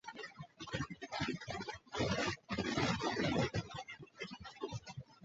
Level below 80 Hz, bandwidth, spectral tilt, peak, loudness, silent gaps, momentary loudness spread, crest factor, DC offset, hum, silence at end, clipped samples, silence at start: -60 dBFS; 8 kHz; -4 dB/octave; -20 dBFS; -40 LUFS; none; 14 LU; 20 dB; under 0.1%; none; 0 s; under 0.1%; 0.05 s